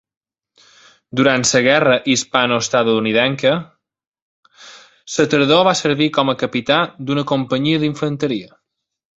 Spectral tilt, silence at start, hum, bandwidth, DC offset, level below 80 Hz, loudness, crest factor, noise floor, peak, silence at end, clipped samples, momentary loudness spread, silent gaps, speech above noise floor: -4 dB/octave; 1.15 s; none; 8.2 kHz; under 0.1%; -58 dBFS; -16 LUFS; 18 dB; -54 dBFS; 0 dBFS; 0.7 s; under 0.1%; 8 LU; 4.07-4.12 s, 4.22-4.43 s; 38 dB